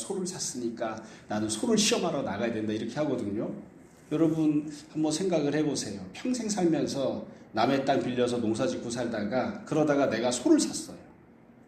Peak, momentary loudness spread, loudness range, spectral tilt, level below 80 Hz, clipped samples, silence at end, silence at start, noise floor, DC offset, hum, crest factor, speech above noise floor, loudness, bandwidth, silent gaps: -10 dBFS; 11 LU; 2 LU; -4.5 dB/octave; -64 dBFS; under 0.1%; 0.55 s; 0 s; -55 dBFS; under 0.1%; none; 18 dB; 26 dB; -29 LUFS; 14.5 kHz; none